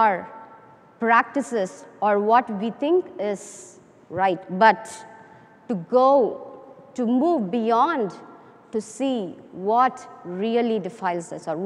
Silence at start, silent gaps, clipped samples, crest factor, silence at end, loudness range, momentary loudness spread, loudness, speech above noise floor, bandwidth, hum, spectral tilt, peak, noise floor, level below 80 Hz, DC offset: 0 s; none; under 0.1%; 20 dB; 0 s; 3 LU; 19 LU; -22 LUFS; 27 dB; 11.5 kHz; none; -5.5 dB/octave; -4 dBFS; -49 dBFS; -74 dBFS; under 0.1%